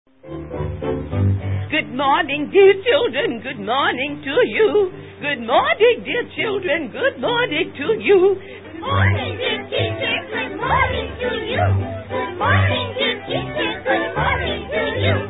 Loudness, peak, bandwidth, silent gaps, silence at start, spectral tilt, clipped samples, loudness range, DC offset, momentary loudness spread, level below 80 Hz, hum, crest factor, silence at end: -19 LUFS; -2 dBFS; 4 kHz; none; 0.25 s; -11 dB/octave; under 0.1%; 3 LU; 0.3%; 10 LU; -36 dBFS; none; 18 dB; 0 s